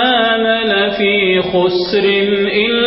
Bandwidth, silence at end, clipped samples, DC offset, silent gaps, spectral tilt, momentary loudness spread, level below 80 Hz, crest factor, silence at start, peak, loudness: 5.8 kHz; 0 s; under 0.1%; under 0.1%; none; -9 dB/octave; 2 LU; -46 dBFS; 10 dB; 0 s; -2 dBFS; -13 LUFS